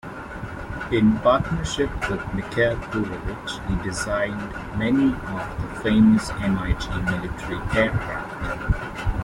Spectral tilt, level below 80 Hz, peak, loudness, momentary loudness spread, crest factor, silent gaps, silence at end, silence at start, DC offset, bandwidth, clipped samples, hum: -6 dB/octave; -34 dBFS; -6 dBFS; -24 LUFS; 12 LU; 18 dB; none; 0 s; 0.05 s; under 0.1%; 12.5 kHz; under 0.1%; none